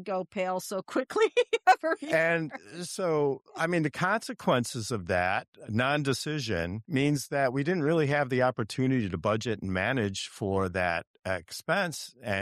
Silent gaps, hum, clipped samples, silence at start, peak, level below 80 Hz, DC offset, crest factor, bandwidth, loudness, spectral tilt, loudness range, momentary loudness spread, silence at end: 5.48-5.53 s, 11.07-11.14 s; none; under 0.1%; 0 s; -10 dBFS; -60 dBFS; under 0.1%; 18 dB; 14.5 kHz; -29 LUFS; -5 dB/octave; 2 LU; 8 LU; 0 s